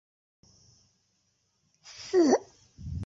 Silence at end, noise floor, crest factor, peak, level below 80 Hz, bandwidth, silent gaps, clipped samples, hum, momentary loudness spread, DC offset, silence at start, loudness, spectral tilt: 0 s; -74 dBFS; 22 dB; -10 dBFS; -52 dBFS; 7.8 kHz; none; under 0.1%; none; 23 LU; under 0.1%; 1.9 s; -26 LUFS; -5.5 dB/octave